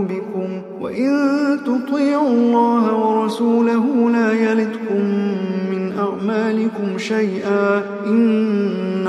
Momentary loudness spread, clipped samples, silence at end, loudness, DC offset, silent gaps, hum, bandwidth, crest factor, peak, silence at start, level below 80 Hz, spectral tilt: 7 LU; under 0.1%; 0 s; -18 LUFS; under 0.1%; none; none; 10.5 kHz; 14 dB; -4 dBFS; 0 s; -70 dBFS; -7 dB/octave